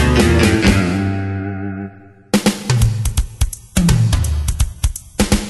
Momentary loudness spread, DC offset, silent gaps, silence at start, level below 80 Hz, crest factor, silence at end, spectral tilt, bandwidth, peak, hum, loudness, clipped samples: 11 LU; under 0.1%; none; 0 s; -22 dBFS; 16 dB; 0 s; -5.5 dB/octave; 12.5 kHz; 0 dBFS; none; -17 LUFS; under 0.1%